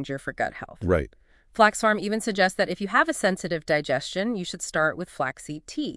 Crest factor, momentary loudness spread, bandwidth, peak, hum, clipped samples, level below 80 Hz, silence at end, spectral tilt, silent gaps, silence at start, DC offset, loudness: 22 dB; 11 LU; 12 kHz; -2 dBFS; none; under 0.1%; -50 dBFS; 0 s; -4 dB/octave; none; 0 s; under 0.1%; -25 LUFS